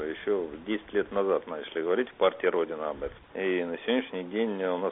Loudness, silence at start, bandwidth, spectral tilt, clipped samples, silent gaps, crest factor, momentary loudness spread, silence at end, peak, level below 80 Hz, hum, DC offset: -30 LUFS; 0 s; 3.9 kHz; -1.5 dB/octave; under 0.1%; none; 18 dB; 8 LU; 0 s; -10 dBFS; -60 dBFS; none; under 0.1%